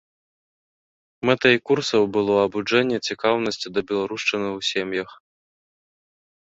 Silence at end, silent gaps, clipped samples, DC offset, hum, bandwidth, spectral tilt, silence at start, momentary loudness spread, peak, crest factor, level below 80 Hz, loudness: 1.35 s; none; under 0.1%; under 0.1%; none; 8 kHz; -4.5 dB/octave; 1.25 s; 9 LU; -2 dBFS; 20 dB; -62 dBFS; -22 LUFS